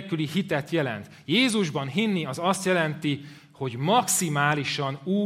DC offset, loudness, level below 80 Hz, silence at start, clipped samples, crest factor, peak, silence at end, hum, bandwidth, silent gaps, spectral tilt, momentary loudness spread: under 0.1%; -25 LUFS; -68 dBFS; 0 s; under 0.1%; 18 dB; -8 dBFS; 0 s; none; 16 kHz; none; -4 dB/octave; 9 LU